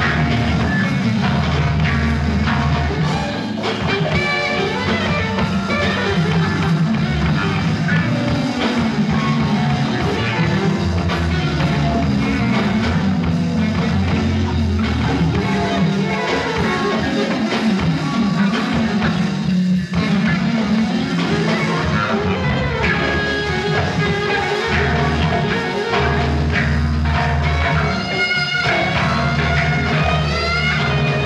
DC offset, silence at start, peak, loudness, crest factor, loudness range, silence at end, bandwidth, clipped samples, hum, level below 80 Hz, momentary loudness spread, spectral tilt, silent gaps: under 0.1%; 0 s; -4 dBFS; -18 LUFS; 14 dB; 1 LU; 0 s; 11.5 kHz; under 0.1%; none; -30 dBFS; 2 LU; -6.5 dB/octave; none